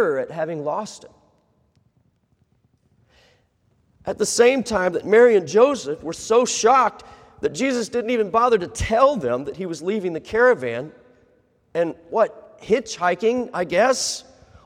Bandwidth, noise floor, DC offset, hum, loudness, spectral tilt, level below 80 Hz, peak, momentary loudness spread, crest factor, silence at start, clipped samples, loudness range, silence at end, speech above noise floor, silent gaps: 14 kHz; -64 dBFS; under 0.1%; none; -20 LUFS; -3.5 dB/octave; -50 dBFS; -4 dBFS; 13 LU; 18 dB; 0 s; under 0.1%; 7 LU; 0.45 s; 44 dB; none